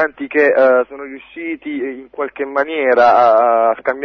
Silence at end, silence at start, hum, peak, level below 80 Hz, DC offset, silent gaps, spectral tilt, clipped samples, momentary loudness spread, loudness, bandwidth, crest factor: 0 s; 0 s; none; -2 dBFS; -60 dBFS; under 0.1%; none; -5.5 dB/octave; under 0.1%; 15 LU; -14 LUFS; 6.4 kHz; 14 dB